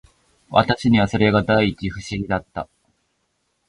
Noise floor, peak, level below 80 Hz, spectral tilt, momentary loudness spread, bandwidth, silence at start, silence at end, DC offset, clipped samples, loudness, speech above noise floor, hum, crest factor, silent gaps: -70 dBFS; 0 dBFS; -42 dBFS; -6.5 dB/octave; 15 LU; 11 kHz; 0.5 s; 1.05 s; under 0.1%; under 0.1%; -19 LUFS; 51 dB; none; 20 dB; none